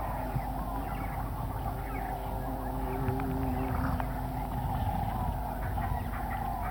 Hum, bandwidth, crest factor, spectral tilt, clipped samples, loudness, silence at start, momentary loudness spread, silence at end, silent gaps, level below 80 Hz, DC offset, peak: none; 17 kHz; 16 dB; -7.5 dB/octave; under 0.1%; -34 LUFS; 0 s; 4 LU; 0 s; none; -38 dBFS; under 0.1%; -18 dBFS